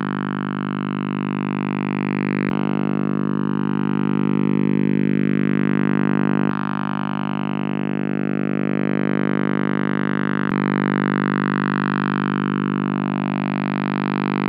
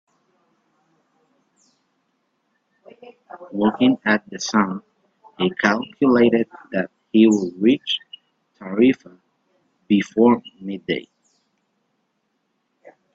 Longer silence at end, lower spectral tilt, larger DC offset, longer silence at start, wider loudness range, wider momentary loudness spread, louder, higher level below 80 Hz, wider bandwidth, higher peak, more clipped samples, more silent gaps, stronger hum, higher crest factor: second, 0 s vs 2.15 s; first, -11 dB/octave vs -5.5 dB/octave; neither; second, 0 s vs 3.35 s; about the same, 3 LU vs 5 LU; second, 5 LU vs 14 LU; about the same, -21 LUFS vs -20 LUFS; about the same, -60 dBFS vs -64 dBFS; second, 5.2 kHz vs 7.8 kHz; second, -8 dBFS vs 0 dBFS; neither; neither; first, 50 Hz at -25 dBFS vs none; second, 12 dB vs 22 dB